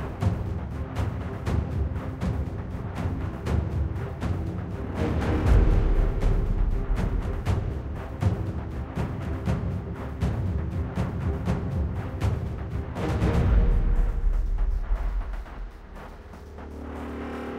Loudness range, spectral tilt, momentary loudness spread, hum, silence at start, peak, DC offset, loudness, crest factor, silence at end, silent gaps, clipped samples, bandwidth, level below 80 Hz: 4 LU; -8 dB/octave; 11 LU; none; 0 s; -8 dBFS; under 0.1%; -29 LUFS; 18 dB; 0 s; none; under 0.1%; 9.6 kHz; -28 dBFS